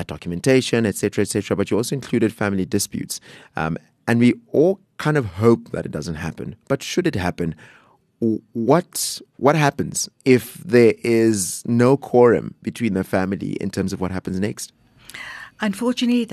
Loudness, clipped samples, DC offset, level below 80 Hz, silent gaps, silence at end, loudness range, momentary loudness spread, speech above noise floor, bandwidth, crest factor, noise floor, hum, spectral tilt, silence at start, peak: -20 LUFS; under 0.1%; under 0.1%; -52 dBFS; none; 0 s; 6 LU; 12 LU; 20 dB; 13.5 kHz; 18 dB; -39 dBFS; none; -5.5 dB/octave; 0 s; -2 dBFS